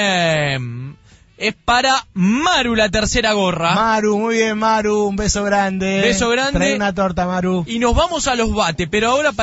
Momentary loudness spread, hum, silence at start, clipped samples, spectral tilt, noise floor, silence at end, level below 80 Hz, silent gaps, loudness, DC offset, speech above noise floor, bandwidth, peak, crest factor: 4 LU; none; 0 s; under 0.1%; -4 dB/octave; -44 dBFS; 0 s; -32 dBFS; none; -16 LUFS; under 0.1%; 28 dB; 8 kHz; -4 dBFS; 14 dB